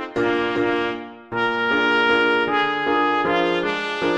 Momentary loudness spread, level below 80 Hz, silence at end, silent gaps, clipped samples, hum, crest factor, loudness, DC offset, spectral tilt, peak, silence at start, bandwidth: 7 LU; -54 dBFS; 0 s; none; under 0.1%; none; 14 dB; -20 LUFS; under 0.1%; -5 dB/octave; -6 dBFS; 0 s; 9 kHz